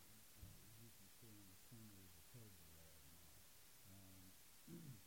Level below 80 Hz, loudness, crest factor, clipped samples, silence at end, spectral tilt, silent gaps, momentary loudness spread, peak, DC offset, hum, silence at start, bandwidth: -76 dBFS; -64 LUFS; 18 dB; under 0.1%; 0 s; -3.5 dB/octave; none; 3 LU; -46 dBFS; under 0.1%; none; 0 s; 16.5 kHz